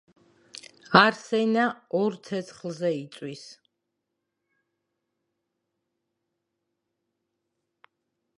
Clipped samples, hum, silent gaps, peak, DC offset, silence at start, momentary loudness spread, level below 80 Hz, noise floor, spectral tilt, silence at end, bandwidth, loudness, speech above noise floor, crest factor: under 0.1%; none; none; -2 dBFS; under 0.1%; 0.9 s; 25 LU; -68 dBFS; -82 dBFS; -5 dB/octave; 4.85 s; 11 kHz; -24 LUFS; 57 dB; 28 dB